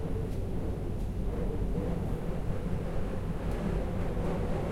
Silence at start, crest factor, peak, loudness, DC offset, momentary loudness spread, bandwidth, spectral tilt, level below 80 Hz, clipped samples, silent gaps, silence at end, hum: 0 s; 14 dB; -18 dBFS; -35 LUFS; under 0.1%; 3 LU; 14.5 kHz; -8 dB/octave; -36 dBFS; under 0.1%; none; 0 s; none